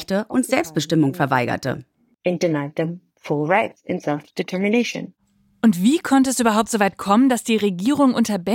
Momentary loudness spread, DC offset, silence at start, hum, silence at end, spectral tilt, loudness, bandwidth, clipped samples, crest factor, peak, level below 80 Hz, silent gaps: 10 LU; under 0.1%; 0 s; none; 0 s; -5 dB/octave; -20 LUFS; 17 kHz; under 0.1%; 16 dB; -2 dBFS; -60 dBFS; none